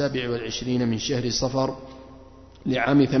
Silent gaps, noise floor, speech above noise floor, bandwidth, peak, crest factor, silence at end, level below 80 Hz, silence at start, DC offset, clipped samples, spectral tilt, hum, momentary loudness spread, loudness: none; -47 dBFS; 23 dB; 6.4 kHz; -8 dBFS; 16 dB; 0 s; -48 dBFS; 0 s; under 0.1%; under 0.1%; -5 dB/octave; none; 17 LU; -24 LUFS